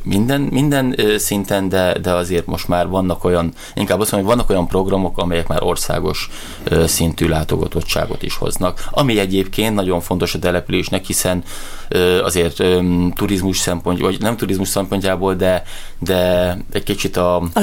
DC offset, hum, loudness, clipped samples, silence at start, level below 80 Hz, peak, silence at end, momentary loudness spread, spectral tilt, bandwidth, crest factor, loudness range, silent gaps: under 0.1%; none; -17 LUFS; under 0.1%; 0 s; -30 dBFS; -4 dBFS; 0 s; 6 LU; -5 dB/octave; 17 kHz; 14 dB; 1 LU; none